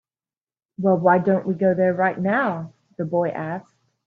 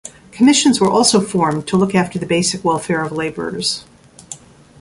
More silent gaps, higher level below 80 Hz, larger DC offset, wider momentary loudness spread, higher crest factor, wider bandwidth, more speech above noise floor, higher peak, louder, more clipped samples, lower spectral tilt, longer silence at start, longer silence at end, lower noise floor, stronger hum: neither; second, -66 dBFS vs -50 dBFS; neither; second, 14 LU vs 21 LU; about the same, 18 dB vs 16 dB; second, 4.3 kHz vs 11.5 kHz; first, over 70 dB vs 22 dB; second, -4 dBFS vs 0 dBFS; second, -21 LUFS vs -16 LUFS; neither; first, -10 dB/octave vs -4 dB/octave; first, 0.8 s vs 0.05 s; about the same, 0.45 s vs 0.45 s; first, under -90 dBFS vs -38 dBFS; neither